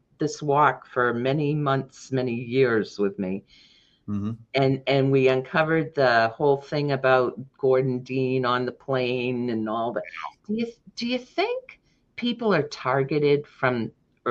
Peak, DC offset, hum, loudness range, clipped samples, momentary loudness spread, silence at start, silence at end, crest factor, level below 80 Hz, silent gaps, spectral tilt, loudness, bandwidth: -6 dBFS; under 0.1%; none; 6 LU; under 0.1%; 10 LU; 0.2 s; 0 s; 18 dB; -64 dBFS; none; -6.5 dB/octave; -24 LUFS; 7.8 kHz